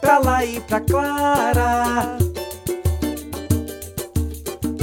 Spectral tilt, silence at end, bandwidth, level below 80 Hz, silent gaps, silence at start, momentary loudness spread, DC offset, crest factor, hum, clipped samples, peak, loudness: -5.5 dB/octave; 0 s; 19.5 kHz; -32 dBFS; none; 0 s; 10 LU; under 0.1%; 18 dB; none; under 0.1%; -2 dBFS; -21 LUFS